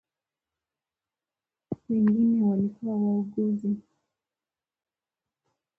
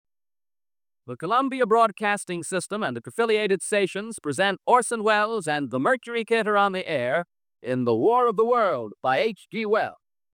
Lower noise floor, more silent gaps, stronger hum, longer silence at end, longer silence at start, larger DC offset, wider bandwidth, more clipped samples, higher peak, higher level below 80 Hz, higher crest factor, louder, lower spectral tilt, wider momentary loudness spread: about the same, under -90 dBFS vs under -90 dBFS; neither; neither; first, 2 s vs 0.4 s; first, 1.7 s vs 1.05 s; neither; second, 2.1 kHz vs 17 kHz; neither; second, -14 dBFS vs -6 dBFS; first, -68 dBFS vs -76 dBFS; about the same, 14 dB vs 18 dB; about the same, -26 LUFS vs -24 LUFS; first, -12 dB/octave vs -4 dB/octave; first, 12 LU vs 9 LU